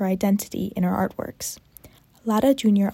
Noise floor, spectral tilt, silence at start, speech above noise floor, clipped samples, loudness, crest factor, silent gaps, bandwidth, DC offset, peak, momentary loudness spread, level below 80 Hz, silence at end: -50 dBFS; -6 dB/octave; 0 s; 28 dB; under 0.1%; -23 LUFS; 16 dB; none; 16.5 kHz; under 0.1%; -8 dBFS; 13 LU; -54 dBFS; 0 s